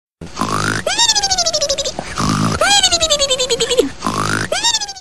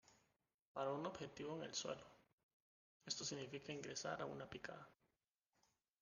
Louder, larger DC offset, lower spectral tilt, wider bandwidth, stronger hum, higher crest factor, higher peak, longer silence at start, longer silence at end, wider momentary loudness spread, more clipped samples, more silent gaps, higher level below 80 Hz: first, -14 LUFS vs -49 LUFS; first, 2% vs under 0.1%; about the same, -2 dB/octave vs -3 dB/octave; first, 14 kHz vs 10 kHz; neither; second, 16 dB vs 22 dB; first, 0 dBFS vs -30 dBFS; about the same, 0.05 s vs 0.1 s; second, 0 s vs 1.1 s; about the same, 9 LU vs 11 LU; neither; second, none vs 0.54-0.75 s, 2.33-3.00 s; first, -38 dBFS vs -82 dBFS